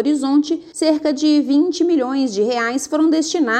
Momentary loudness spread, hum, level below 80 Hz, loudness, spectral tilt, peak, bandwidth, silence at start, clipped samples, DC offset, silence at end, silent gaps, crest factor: 4 LU; none; -64 dBFS; -17 LUFS; -3 dB/octave; -4 dBFS; 10.5 kHz; 0 s; under 0.1%; under 0.1%; 0 s; none; 12 dB